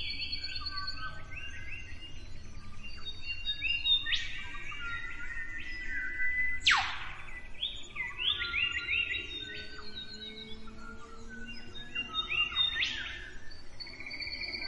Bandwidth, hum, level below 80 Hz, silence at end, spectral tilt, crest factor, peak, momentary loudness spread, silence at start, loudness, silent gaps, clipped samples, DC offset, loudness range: 10.5 kHz; none; -48 dBFS; 0 s; -1.5 dB/octave; 22 dB; -12 dBFS; 20 LU; 0 s; -33 LUFS; none; under 0.1%; under 0.1%; 8 LU